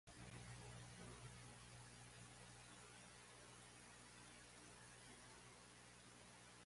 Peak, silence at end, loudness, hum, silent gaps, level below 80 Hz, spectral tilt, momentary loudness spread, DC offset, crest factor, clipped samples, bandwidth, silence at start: -44 dBFS; 0 s; -61 LUFS; 60 Hz at -70 dBFS; none; -74 dBFS; -3 dB/octave; 5 LU; under 0.1%; 18 dB; under 0.1%; 11.5 kHz; 0.05 s